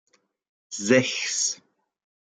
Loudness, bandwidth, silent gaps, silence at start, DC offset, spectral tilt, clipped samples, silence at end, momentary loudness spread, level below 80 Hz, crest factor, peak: -23 LUFS; 10 kHz; none; 0.7 s; under 0.1%; -2.5 dB/octave; under 0.1%; 0.7 s; 16 LU; -74 dBFS; 22 dB; -6 dBFS